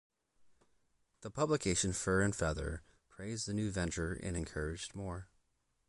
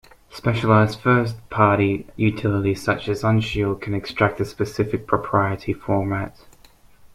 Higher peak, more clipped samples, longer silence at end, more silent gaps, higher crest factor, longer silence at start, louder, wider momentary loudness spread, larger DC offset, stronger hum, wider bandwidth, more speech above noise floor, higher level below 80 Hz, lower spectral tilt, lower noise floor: second, -20 dBFS vs -2 dBFS; neither; first, 0.65 s vs 0.1 s; neither; about the same, 18 dB vs 20 dB; about the same, 0.4 s vs 0.35 s; second, -37 LUFS vs -21 LUFS; first, 14 LU vs 9 LU; neither; neither; second, 11.5 kHz vs 13.5 kHz; first, 42 dB vs 30 dB; about the same, -50 dBFS vs -46 dBFS; second, -4.5 dB/octave vs -7.5 dB/octave; first, -78 dBFS vs -50 dBFS